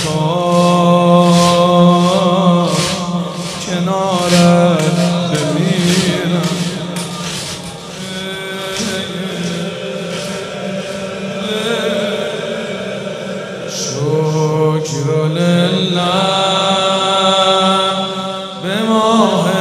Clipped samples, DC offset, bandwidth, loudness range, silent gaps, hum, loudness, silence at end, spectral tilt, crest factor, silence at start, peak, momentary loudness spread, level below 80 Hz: under 0.1%; under 0.1%; 13.5 kHz; 9 LU; none; none; -14 LUFS; 0 s; -5 dB/octave; 14 dB; 0 s; 0 dBFS; 12 LU; -52 dBFS